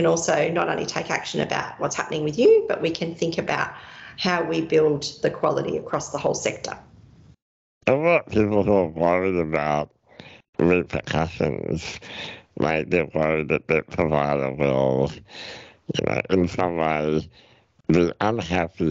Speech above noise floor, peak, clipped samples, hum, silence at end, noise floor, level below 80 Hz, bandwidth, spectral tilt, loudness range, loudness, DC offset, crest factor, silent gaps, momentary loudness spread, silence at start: 28 dB; -6 dBFS; under 0.1%; none; 0 s; -50 dBFS; -48 dBFS; 8.2 kHz; -5.5 dB/octave; 3 LU; -23 LUFS; under 0.1%; 16 dB; 7.42-7.81 s, 10.49-10.53 s; 13 LU; 0 s